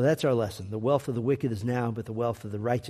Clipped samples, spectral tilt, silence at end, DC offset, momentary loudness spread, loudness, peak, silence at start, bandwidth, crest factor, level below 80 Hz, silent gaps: under 0.1%; -7 dB/octave; 0 s; under 0.1%; 6 LU; -29 LUFS; -10 dBFS; 0 s; 14.5 kHz; 16 dB; -60 dBFS; none